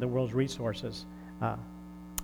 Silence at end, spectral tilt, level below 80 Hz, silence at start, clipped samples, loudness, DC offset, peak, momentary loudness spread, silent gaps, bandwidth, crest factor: 0 s; -6 dB/octave; -54 dBFS; 0 s; under 0.1%; -34 LUFS; under 0.1%; -12 dBFS; 16 LU; none; over 20 kHz; 22 dB